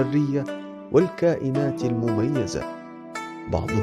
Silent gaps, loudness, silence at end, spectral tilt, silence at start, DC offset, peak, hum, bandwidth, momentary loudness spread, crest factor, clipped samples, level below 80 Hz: none; -24 LUFS; 0 s; -7.5 dB/octave; 0 s; under 0.1%; -6 dBFS; none; 12.5 kHz; 13 LU; 18 dB; under 0.1%; -48 dBFS